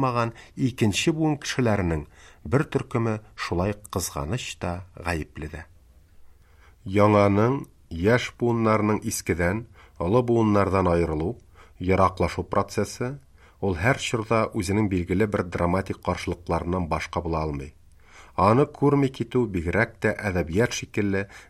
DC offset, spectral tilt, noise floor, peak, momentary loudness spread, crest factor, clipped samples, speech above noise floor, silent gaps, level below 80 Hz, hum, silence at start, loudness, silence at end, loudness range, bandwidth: under 0.1%; -6 dB/octave; -54 dBFS; -6 dBFS; 11 LU; 20 dB; under 0.1%; 29 dB; none; -44 dBFS; none; 0 s; -25 LUFS; 0.05 s; 5 LU; 14.5 kHz